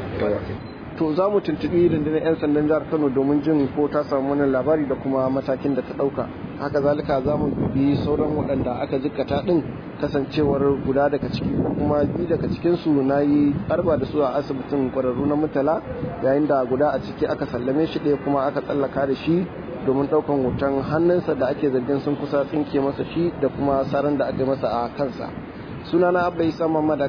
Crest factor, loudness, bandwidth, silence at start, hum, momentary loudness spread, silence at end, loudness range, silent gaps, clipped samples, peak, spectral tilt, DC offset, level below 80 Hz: 14 dB; -22 LUFS; 5.4 kHz; 0 s; none; 6 LU; 0 s; 2 LU; none; under 0.1%; -8 dBFS; -9.5 dB/octave; under 0.1%; -46 dBFS